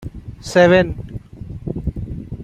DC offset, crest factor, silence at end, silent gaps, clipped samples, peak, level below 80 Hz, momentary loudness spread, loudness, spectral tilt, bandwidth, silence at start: under 0.1%; 18 dB; 0 s; none; under 0.1%; -2 dBFS; -34 dBFS; 22 LU; -17 LUFS; -6.5 dB/octave; 10.5 kHz; 0 s